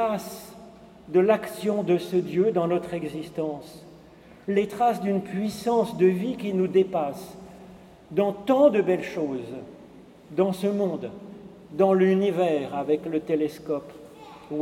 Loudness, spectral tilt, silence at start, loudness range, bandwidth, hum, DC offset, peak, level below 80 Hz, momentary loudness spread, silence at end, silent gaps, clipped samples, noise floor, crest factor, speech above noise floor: -25 LUFS; -7 dB/octave; 0 s; 3 LU; 16 kHz; none; under 0.1%; -8 dBFS; -62 dBFS; 20 LU; 0 s; none; under 0.1%; -50 dBFS; 18 dB; 25 dB